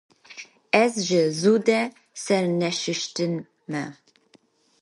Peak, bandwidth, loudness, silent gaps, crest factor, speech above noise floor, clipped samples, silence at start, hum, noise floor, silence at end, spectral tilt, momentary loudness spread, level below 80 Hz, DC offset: -4 dBFS; 11.5 kHz; -23 LUFS; none; 22 dB; 38 dB; under 0.1%; 0.3 s; none; -60 dBFS; 0.9 s; -4.5 dB/octave; 18 LU; -74 dBFS; under 0.1%